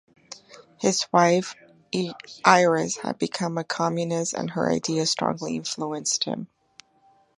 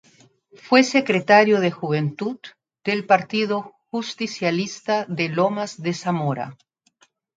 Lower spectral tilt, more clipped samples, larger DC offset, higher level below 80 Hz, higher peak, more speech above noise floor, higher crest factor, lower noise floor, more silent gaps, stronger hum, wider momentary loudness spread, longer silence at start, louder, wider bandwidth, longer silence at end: second, -3.5 dB/octave vs -5.5 dB/octave; neither; neither; about the same, -68 dBFS vs -70 dBFS; about the same, 0 dBFS vs 0 dBFS; second, 37 dB vs 41 dB; about the same, 24 dB vs 22 dB; about the same, -61 dBFS vs -62 dBFS; neither; neither; about the same, 15 LU vs 14 LU; second, 0.3 s vs 0.65 s; second, -24 LUFS vs -21 LUFS; first, 11.5 kHz vs 9.2 kHz; about the same, 0.95 s vs 0.85 s